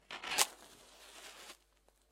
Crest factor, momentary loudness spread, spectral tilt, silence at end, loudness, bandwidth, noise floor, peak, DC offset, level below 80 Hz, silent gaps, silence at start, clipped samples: 36 dB; 24 LU; 1.5 dB/octave; 0.55 s; -34 LUFS; 16 kHz; -71 dBFS; -8 dBFS; under 0.1%; -74 dBFS; none; 0.1 s; under 0.1%